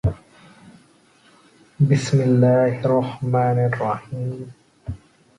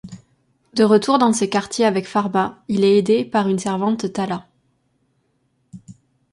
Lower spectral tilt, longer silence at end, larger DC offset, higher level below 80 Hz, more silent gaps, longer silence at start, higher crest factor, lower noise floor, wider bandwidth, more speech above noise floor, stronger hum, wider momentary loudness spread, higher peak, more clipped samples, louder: first, -8 dB/octave vs -5.5 dB/octave; about the same, 0.45 s vs 0.4 s; neither; first, -44 dBFS vs -60 dBFS; neither; about the same, 0.05 s vs 0.05 s; about the same, 16 dB vs 18 dB; second, -55 dBFS vs -66 dBFS; about the same, 11 kHz vs 11.5 kHz; second, 36 dB vs 49 dB; neither; first, 21 LU vs 10 LU; about the same, -4 dBFS vs -2 dBFS; neither; about the same, -20 LUFS vs -18 LUFS